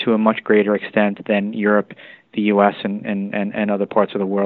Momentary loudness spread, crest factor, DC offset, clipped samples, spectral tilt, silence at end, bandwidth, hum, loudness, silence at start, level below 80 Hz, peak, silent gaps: 8 LU; 18 dB; under 0.1%; under 0.1%; -10.5 dB/octave; 0 s; 4.2 kHz; none; -19 LUFS; 0 s; -64 dBFS; 0 dBFS; none